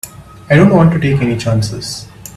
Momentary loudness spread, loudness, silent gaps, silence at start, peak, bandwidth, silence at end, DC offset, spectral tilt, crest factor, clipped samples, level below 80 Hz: 16 LU; -12 LUFS; none; 0.05 s; 0 dBFS; 14.5 kHz; 0.1 s; under 0.1%; -6.5 dB/octave; 12 dB; under 0.1%; -38 dBFS